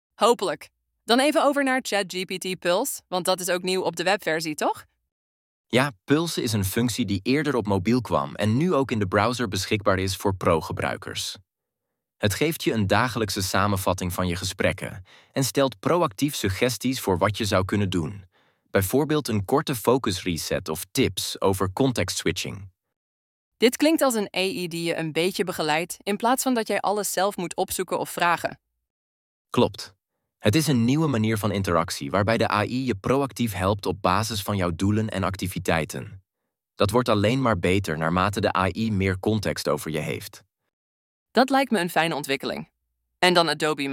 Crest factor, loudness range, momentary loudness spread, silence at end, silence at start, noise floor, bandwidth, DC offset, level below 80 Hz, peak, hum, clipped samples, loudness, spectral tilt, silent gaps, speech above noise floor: 22 dB; 2 LU; 7 LU; 0 s; 0.2 s; -84 dBFS; 17 kHz; under 0.1%; -54 dBFS; -2 dBFS; none; under 0.1%; -24 LUFS; -4.5 dB/octave; 5.12-5.64 s, 22.96-23.52 s, 28.90-29.45 s, 40.73-41.26 s; 60 dB